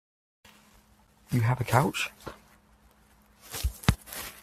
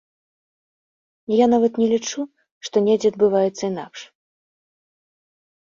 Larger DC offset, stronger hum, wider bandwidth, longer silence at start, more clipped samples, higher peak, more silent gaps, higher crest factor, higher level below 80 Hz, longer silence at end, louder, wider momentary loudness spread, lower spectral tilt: neither; neither; first, 16 kHz vs 7.4 kHz; about the same, 1.3 s vs 1.3 s; neither; first, -2 dBFS vs -6 dBFS; second, none vs 2.52-2.61 s; first, 30 dB vs 18 dB; first, -44 dBFS vs -66 dBFS; second, 0.05 s vs 1.7 s; second, -29 LUFS vs -20 LUFS; second, 15 LU vs 19 LU; about the same, -5 dB/octave vs -5 dB/octave